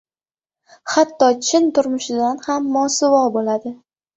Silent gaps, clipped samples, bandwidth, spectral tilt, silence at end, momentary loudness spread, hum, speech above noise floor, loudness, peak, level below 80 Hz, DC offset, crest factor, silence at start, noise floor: none; under 0.1%; 8.2 kHz; -2.5 dB/octave; 0.4 s; 8 LU; none; over 73 dB; -17 LUFS; -2 dBFS; -64 dBFS; under 0.1%; 18 dB; 0.85 s; under -90 dBFS